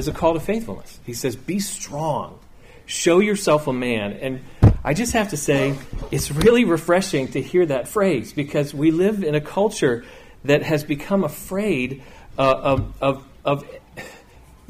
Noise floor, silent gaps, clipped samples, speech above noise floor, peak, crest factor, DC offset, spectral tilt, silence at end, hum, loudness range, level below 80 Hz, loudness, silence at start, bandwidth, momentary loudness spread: -47 dBFS; none; under 0.1%; 27 dB; -2 dBFS; 18 dB; under 0.1%; -5.5 dB/octave; 0.55 s; none; 4 LU; -36 dBFS; -21 LUFS; 0 s; 15.5 kHz; 12 LU